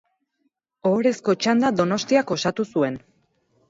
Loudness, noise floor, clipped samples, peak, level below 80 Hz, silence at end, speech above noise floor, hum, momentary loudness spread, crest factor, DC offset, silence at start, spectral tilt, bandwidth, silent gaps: -22 LUFS; -73 dBFS; under 0.1%; -6 dBFS; -64 dBFS; 0.7 s; 52 dB; none; 6 LU; 18 dB; under 0.1%; 0.85 s; -5 dB/octave; 7.8 kHz; none